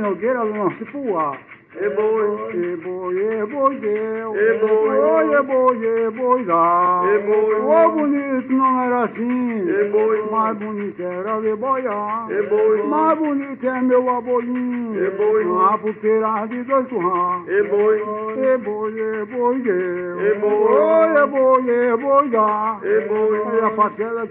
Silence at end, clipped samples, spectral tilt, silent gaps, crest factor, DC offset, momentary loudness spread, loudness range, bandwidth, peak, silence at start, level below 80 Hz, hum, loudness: 0 s; under 0.1%; -6 dB/octave; none; 16 dB; under 0.1%; 8 LU; 4 LU; 3.8 kHz; -2 dBFS; 0 s; -70 dBFS; none; -19 LUFS